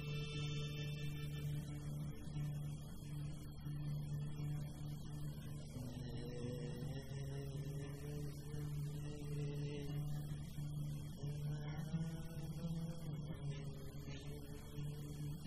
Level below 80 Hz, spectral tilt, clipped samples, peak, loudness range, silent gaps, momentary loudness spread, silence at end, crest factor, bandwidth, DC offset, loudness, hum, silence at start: -56 dBFS; -6.5 dB/octave; under 0.1%; -32 dBFS; 2 LU; none; 5 LU; 0 s; 12 dB; 15.5 kHz; under 0.1%; -47 LUFS; none; 0 s